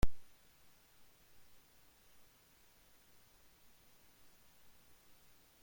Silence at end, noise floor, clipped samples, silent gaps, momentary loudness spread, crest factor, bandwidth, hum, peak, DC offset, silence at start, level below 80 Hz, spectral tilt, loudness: 5.4 s; -67 dBFS; under 0.1%; none; 1 LU; 24 dB; 16.5 kHz; none; -18 dBFS; under 0.1%; 0.05 s; -52 dBFS; -5.5 dB/octave; -60 LUFS